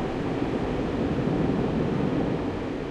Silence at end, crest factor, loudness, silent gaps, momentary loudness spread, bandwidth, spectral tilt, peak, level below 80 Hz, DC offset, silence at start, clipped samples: 0 s; 14 dB; -27 LUFS; none; 4 LU; 10 kHz; -8 dB/octave; -12 dBFS; -40 dBFS; under 0.1%; 0 s; under 0.1%